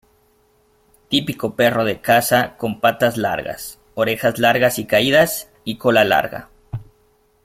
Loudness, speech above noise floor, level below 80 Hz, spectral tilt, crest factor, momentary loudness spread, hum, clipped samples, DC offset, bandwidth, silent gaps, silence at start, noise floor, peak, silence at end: -17 LUFS; 41 dB; -52 dBFS; -4 dB/octave; 18 dB; 16 LU; none; under 0.1%; under 0.1%; 16.5 kHz; none; 1.1 s; -58 dBFS; -2 dBFS; 0.6 s